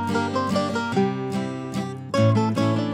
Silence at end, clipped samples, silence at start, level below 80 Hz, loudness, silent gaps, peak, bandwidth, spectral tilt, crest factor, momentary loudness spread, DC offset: 0 s; under 0.1%; 0 s; -62 dBFS; -23 LUFS; none; -8 dBFS; 12.5 kHz; -7 dB/octave; 14 dB; 9 LU; under 0.1%